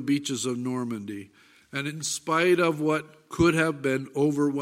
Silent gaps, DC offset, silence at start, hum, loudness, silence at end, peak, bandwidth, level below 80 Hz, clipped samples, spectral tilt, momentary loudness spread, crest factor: none; under 0.1%; 0 s; none; -26 LUFS; 0 s; -8 dBFS; 16 kHz; -56 dBFS; under 0.1%; -5 dB/octave; 13 LU; 18 dB